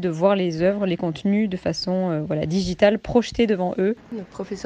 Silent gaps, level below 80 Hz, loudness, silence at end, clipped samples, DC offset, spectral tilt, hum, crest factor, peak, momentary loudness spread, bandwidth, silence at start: none; -46 dBFS; -22 LUFS; 0 s; under 0.1%; under 0.1%; -6.5 dB/octave; none; 18 dB; -4 dBFS; 6 LU; 9 kHz; 0 s